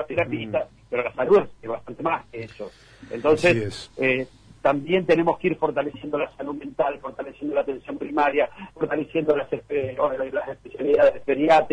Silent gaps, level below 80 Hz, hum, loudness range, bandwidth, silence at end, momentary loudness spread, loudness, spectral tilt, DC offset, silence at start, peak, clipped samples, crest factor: none; -56 dBFS; none; 4 LU; 10.5 kHz; 0 s; 14 LU; -24 LUFS; -6.5 dB/octave; under 0.1%; 0 s; -8 dBFS; under 0.1%; 16 dB